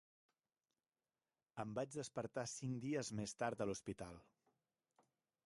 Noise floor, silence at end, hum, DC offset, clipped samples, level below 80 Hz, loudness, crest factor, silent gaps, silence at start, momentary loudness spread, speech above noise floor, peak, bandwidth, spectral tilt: under -90 dBFS; 1.25 s; none; under 0.1%; under 0.1%; -76 dBFS; -46 LUFS; 22 dB; none; 1.55 s; 10 LU; over 44 dB; -26 dBFS; 11.5 kHz; -5 dB/octave